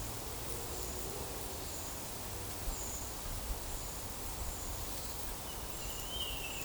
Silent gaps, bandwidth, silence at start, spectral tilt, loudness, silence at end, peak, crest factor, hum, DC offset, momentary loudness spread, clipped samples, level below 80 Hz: none; over 20 kHz; 0 s; -2.5 dB/octave; -40 LUFS; 0 s; -20 dBFS; 22 dB; none; under 0.1%; 3 LU; under 0.1%; -48 dBFS